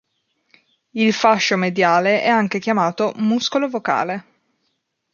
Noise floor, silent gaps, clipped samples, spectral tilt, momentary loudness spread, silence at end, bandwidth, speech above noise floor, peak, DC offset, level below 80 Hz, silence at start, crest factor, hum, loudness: -71 dBFS; none; under 0.1%; -4.5 dB/octave; 6 LU; 0.95 s; 7.2 kHz; 54 dB; -2 dBFS; under 0.1%; -68 dBFS; 0.95 s; 18 dB; none; -18 LUFS